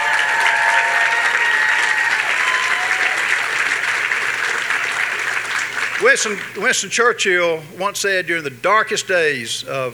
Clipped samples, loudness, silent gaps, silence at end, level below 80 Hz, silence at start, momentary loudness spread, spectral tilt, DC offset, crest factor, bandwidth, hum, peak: under 0.1%; -16 LUFS; none; 0 s; -66 dBFS; 0 s; 6 LU; -1 dB/octave; under 0.1%; 18 dB; over 20 kHz; none; 0 dBFS